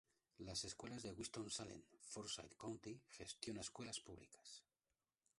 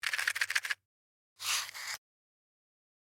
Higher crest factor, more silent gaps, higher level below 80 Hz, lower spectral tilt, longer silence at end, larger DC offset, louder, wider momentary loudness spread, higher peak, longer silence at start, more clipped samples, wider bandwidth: about the same, 24 dB vs 26 dB; second, none vs 0.85-1.36 s; first, -74 dBFS vs -88 dBFS; first, -3 dB/octave vs 3.5 dB/octave; second, 0.75 s vs 1.05 s; neither; second, -52 LUFS vs -34 LUFS; first, 12 LU vs 9 LU; second, -30 dBFS vs -14 dBFS; first, 0.4 s vs 0.05 s; neither; second, 11.5 kHz vs over 20 kHz